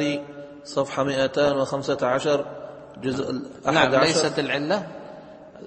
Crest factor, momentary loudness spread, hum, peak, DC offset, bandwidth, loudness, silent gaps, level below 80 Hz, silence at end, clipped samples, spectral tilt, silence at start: 20 dB; 20 LU; none; -4 dBFS; under 0.1%; 8.8 kHz; -23 LUFS; none; -58 dBFS; 0 s; under 0.1%; -4.5 dB/octave; 0 s